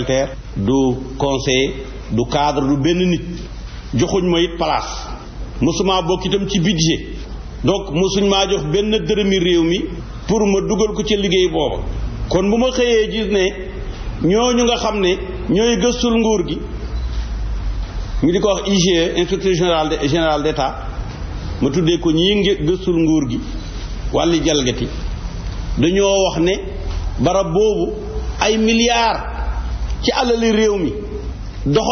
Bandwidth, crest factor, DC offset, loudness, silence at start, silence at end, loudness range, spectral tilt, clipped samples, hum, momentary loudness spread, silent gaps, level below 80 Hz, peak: 6.6 kHz; 14 dB; under 0.1%; -17 LUFS; 0 s; 0 s; 2 LU; -4.5 dB/octave; under 0.1%; none; 13 LU; none; -28 dBFS; -2 dBFS